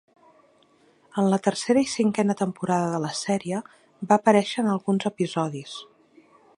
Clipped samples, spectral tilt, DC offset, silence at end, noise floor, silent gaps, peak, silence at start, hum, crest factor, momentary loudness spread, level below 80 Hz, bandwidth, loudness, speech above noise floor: under 0.1%; -5.5 dB/octave; under 0.1%; 0.75 s; -60 dBFS; none; -4 dBFS; 1.15 s; none; 22 dB; 12 LU; -70 dBFS; 11.5 kHz; -24 LUFS; 37 dB